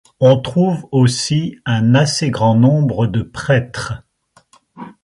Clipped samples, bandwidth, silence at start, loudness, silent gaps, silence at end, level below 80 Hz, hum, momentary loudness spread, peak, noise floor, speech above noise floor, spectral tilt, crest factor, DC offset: under 0.1%; 11.5 kHz; 0.2 s; -15 LUFS; none; 0.15 s; -46 dBFS; none; 9 LU; 0 dBFS; -54 dBFS; 40 dB; -6 dB/octave; 14 dB; under 0.1%